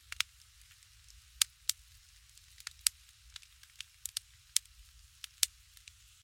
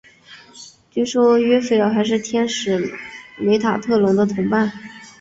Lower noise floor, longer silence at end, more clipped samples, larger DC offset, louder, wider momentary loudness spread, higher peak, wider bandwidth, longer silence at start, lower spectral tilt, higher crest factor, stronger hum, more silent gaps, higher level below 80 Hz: first, -61 dBFS vs -45 dBFS; first, 0.8 s vs 0.1 s; neither; neither; second, -35 LUFS vs -18 LUFS; first, 25 LU vs 16 LU; about the same, -2 dBFS vs -4 dBFS; first, 16.5 kHz vs 8 kHz; first, 1.4 s vs 0.3 s; second, 4 dB/octave vs -5.5 dB/octave; first, 40 dB vs 14 dB; neither; neither; second, -64 dBFS vs -58 dBFS